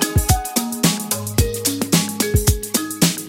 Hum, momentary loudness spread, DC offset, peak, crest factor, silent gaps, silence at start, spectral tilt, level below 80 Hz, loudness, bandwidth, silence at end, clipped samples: none; 4 LU; under 0.1%; -2 dBFS; 18 dB; none; 0 s; -4 dB/octave; -28 dBFS; -19 LUFS; 17 kHz; 0 s; under 0.1%